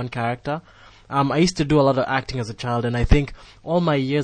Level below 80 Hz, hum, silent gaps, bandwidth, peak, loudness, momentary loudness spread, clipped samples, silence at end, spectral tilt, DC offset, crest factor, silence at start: -30 dBFS; none; none; 9.8 kHz; -2 dBFS; -21 LUFS; 11 LU; under 0.1%; 0 s; -6.5 dB/octave; under 0.1%; 20 dB; 0 s